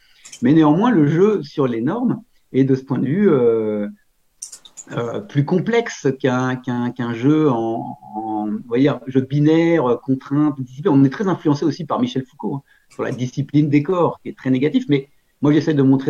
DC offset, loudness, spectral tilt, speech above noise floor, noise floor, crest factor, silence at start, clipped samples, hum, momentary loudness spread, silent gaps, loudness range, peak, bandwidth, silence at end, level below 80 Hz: under 0.1%; -18 LUFS; -7.5 dB/octave; 22 dB; -40 dBFS; 14 dB; 0.25 s; under 0.1%; none; 13 LU; none; 3 LU; -4 dBFS; 10 kHz; 0 s; -64 dBFS